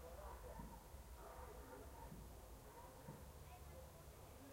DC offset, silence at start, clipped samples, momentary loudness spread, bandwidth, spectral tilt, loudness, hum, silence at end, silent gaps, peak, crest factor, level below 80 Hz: under 0.1%; 0 s; under 0.1%; 4 LU; 16 kHz; -5 dB/octave; -59 LUFS; none; 0 s; none; -42 dBFS; 16 dB; -62 dBFS